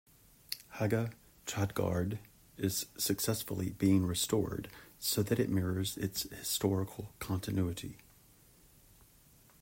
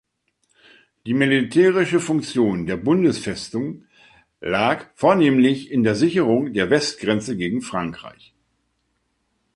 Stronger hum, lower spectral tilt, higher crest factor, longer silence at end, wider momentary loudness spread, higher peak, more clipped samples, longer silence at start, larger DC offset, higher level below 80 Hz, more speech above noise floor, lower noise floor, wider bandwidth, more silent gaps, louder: neither; about the same, -5 dB/octave vs -5.5 dB/octave; about the same, 20 dB vs 18 dB; first, 1.65 s vs 1.45 s; about the same, 12 LU vs 11 LU; second, -16 dBFS vs -4 dBFS; neither; second, 0.5 s vs 1.05 s; neither; second, -62 dBFS vs -54 dBFS; second, 29 dB vs 51 dB; second, -63 dBFS vs -70 dBFS; first, 16.5 kHz vs 11.5 kHz; neither; second, -35 LUFS vs -20 LUFS